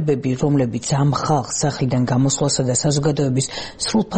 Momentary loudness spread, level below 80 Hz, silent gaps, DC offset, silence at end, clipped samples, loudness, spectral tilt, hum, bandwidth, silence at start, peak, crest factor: 3 LU; -46 dBFS; none; 0.2%; 0 s; under 0.1%; -19 LUFS; -5 dB/octave; none; 8.8 kHz; 0 s; -6 dBFS; 14 dB